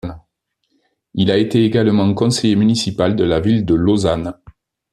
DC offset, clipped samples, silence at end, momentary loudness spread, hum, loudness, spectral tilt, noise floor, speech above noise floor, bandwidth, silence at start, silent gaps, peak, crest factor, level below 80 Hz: under 0.1%; under 0.1%; 0.6 s; 7 LU; none; -15 LUFS; -6 dB/octave; -70 dBFS; 56 dB; 12.5 kHz; 0.05 s; none; -2 dBFS; 14 dB; -44 dBFS